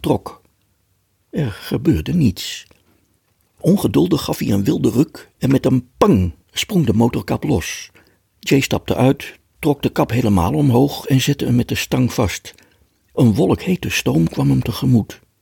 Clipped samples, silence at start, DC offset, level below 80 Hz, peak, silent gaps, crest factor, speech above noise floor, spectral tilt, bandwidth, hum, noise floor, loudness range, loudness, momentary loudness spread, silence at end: under 0.1%; 0.05 s; under 0.1%; -42 dBFS; -2 dBFS; none; 16 dB; 47 dB; -6 dB/octave; 18 kHz; none; -63 dBFS; 2 LU; -18 LUFS; 9 LU; 0.25 s